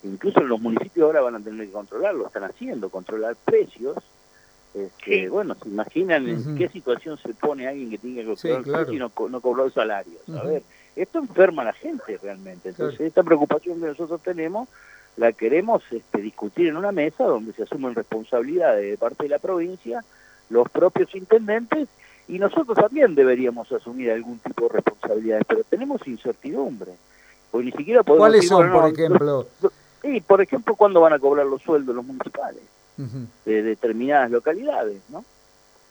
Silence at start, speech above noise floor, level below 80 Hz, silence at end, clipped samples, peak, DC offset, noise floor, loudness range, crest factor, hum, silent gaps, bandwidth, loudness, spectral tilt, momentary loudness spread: 0.05 s; 34 dB; -66 dBFS; 0.65 s; under 0.1%; 0 dBFS; under 0.1%; -56 dBFS; 8 LU; 22 dB; none; none; over 20 kHz; -21 LUFS; -6.5 dB/octave; 16 LU